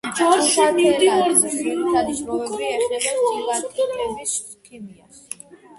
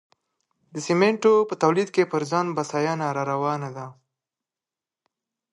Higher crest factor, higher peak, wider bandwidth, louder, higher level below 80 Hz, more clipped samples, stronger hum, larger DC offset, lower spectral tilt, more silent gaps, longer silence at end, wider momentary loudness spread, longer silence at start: about the same, 18 dB vs 20 dB; about the same, -2 dBFS vs -4 dBFS; about the same, 12 kHz vs 11 kHz; first, -19 LUFS vs -23 LUFS; first, -56 dBFS vs -74 dBFS; neither; neither; neither; second, -2 dB/octave vs -5.5 dB/octave; neither; second, 0.6 s vs 1.6 s; first, 20 LU vs 15 LU; second, 0.05 s vs 0.75 s